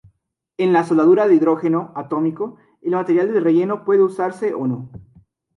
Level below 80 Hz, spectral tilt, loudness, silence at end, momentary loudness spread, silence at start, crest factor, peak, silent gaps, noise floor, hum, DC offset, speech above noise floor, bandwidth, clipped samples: -62 dBFS; -8.5 dB/octave; -18 LUFS; 0.6 s; 15 LU; 0.6 s; 16 dB; -4 dBFS; none; -61 dBFS; none; under 0.1%; 44 dB; 10.5 kHz; under 0.1%